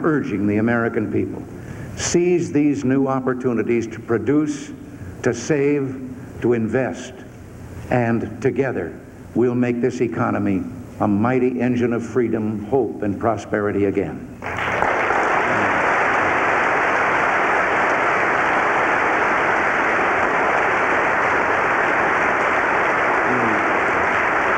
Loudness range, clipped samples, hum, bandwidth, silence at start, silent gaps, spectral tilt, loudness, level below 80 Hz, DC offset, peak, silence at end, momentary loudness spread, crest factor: 5 LU; under 0.1%; none; 16 kHz; 0 s; none; -5.5 dB/octave; -19 LUFS; -48 dBFS; under 0.1%; -2 dBFS; 0 s; 11 LU; 16 dB